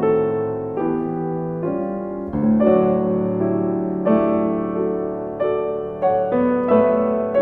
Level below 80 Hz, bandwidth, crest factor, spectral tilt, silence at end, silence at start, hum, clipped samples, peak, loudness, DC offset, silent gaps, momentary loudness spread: -48 dBFS; 3.8 kHz; 14 dB; -11.5 dB/octave; 0 s; 0 s; none; under 0.1%; -4 dBFS; -20 LUFS; under 0.1%; none; 9 LU